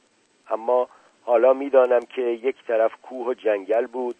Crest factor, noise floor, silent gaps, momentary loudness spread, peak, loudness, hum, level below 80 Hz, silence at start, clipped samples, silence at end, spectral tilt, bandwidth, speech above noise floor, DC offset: 18 dB; -56 dBFS; none; 12 LU; -4 dBFS; -22 LUFS; none; -80 dBFS; 0.5 s; under 0.1%; 0.05 s; -5 dB/octave; 8.4 kHz; 35 dB; under 0.1%